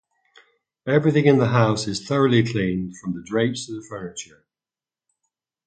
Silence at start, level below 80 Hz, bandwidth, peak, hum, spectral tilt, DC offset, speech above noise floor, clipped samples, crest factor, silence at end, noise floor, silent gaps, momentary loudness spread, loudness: 0.85 s; -56 dBFS; 9.2 kHz; -2 dBFS; none; -6 dB/octave; under 0.1%; over 69 dB; under 0.1%; 20 dB; 1.45 s; under -90 dBFS; none; 16 LU; -21 LUFS